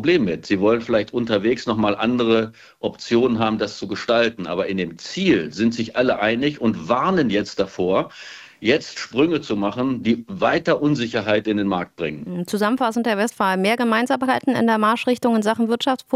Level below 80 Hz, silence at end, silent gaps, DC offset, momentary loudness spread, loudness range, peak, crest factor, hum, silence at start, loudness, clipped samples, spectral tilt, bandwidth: -54 dBFS; 0 s; none; under 0.1%; 7 LU; 2 LU; -4 dBFS; 16 dB; none; 0 s; -20 LUFS; under 0.1%; -5.5 dB/octave; 14.5 kHz